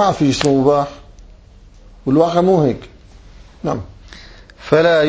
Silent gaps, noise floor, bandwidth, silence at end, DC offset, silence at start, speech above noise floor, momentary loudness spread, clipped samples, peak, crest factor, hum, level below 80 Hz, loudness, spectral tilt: none; -42 dBFS; 8 kHz; 0 s; under 0.1%; 0 s; 28 dB; 14 LU; under 0.1%; 0 dBFS; 16 dB; none; -42 dBFS; -16 LUFS; -6 dB/octave